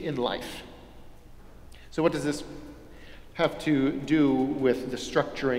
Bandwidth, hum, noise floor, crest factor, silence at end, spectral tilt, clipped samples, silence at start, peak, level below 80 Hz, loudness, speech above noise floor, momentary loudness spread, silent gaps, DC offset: 15.5 kHz; none; -47 dBFS; 20 dB; 0 s; -6 dB/octave; under 0.1%; 0 s; -8 dBFS; -50 dBFS; -27 LUFS; 21 dB; 20 LU; none; under 0.1%